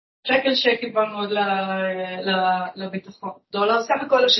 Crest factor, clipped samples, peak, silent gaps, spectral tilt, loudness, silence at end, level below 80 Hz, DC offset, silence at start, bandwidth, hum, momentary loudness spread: 16 dB; under 0.1%; -6 dBFS; none; -4 dB/octave; -22 LUFS; 0 s; -70 dBFS; under 0.1%; 0.25 s; 6.2 kHz; none; 13 LU